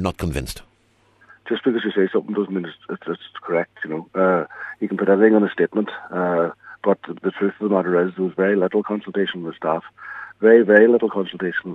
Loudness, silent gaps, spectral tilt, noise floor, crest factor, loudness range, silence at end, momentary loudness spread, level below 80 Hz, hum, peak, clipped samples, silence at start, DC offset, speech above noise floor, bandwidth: -20 LUFS; none; -7 dB/octave; -59 dBFS; 20 dB; 6 LU; 0 s; 15 LU; -46 dBFS; none; 0 dBFS; under 0.1%; 0 s; under 0.1%; 40 dB; 13 kHz